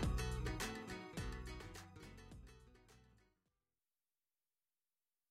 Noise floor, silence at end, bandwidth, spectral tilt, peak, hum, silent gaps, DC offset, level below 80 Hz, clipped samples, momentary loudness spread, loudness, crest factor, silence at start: under -90 dBFS; 2.25 s; 16 kHz; -5 dB/octave; -32 dBFS; none; none; under 0.1%; -52 dBFS; under 0.1%; 23 LU; -47 LUFS; 18 dB; 0 s